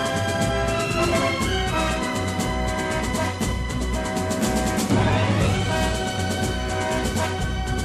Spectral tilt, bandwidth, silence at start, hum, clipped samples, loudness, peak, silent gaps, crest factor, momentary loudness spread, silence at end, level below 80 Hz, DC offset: -5 dB/octave; 15 kHz; 0 s; none; under 0.1%; -23 LUFS; -8 dBFS; none; 14 dB; 5 LU; 0 s; -32 dBFS; under 0.1%